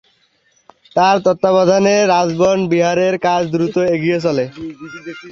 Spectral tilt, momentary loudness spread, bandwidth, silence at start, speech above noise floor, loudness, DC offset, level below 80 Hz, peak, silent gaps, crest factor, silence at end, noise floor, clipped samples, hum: -5.5 dB/octave; 16 LU; 7.6 kHz; 0.95 s; 44 dB; -14 LUFS; under 0.1%; -56 dBFS; -2 dBFS; none; 14 dB; 0 s; -58 dBFS; under 0.1%; none